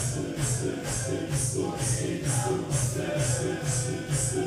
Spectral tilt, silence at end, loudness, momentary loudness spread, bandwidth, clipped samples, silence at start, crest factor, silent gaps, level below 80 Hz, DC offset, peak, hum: -4.5 dB/octave; 0 s; -28 LUFS; 2 LU; 15.5 kHz; under 0.1%; 0 s; 14 dB; none; -46 dBFS; under 0.1%; -14 dBFS; none